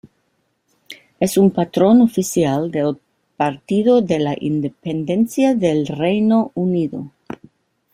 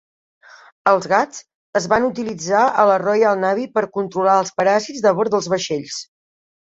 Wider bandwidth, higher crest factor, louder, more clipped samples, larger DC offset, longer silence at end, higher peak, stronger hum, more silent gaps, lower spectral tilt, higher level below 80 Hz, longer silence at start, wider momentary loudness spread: first, 16 kHz vs 8 kHz; about the same, 16 dB vs 18 dB; about the same, -17 LUFS vs -18 LUFS; neither; neither; first, 0.85 s vs 0.7 s; about the same, -2 dBFS vs 0 dBFS; neither; second, none vs 1.55-1.73 s; first, -6.5 dB/octave vs -4 dB/octave; about the same, -56 dBFS vs -60 dBFS; about the same, 0.9 s vs 0.85 s; about the same, 11 LU vs 9 LU